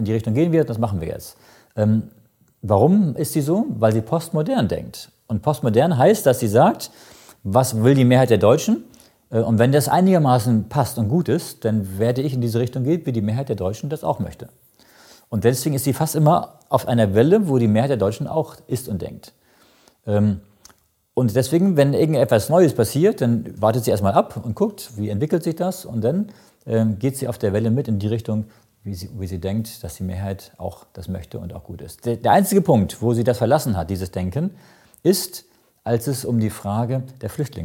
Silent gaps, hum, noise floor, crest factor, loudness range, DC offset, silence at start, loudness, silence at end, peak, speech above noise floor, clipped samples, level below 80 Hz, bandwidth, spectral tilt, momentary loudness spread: none; none; -58 dBFS; 18 dB; 7 LU; under 0.1%; 0 s; -20 LUFS; 0 s; -2 dBFS; 39 dB; under 0.1%; -52 dBFS; 17 kHz; -7 dB/octave; 15 LU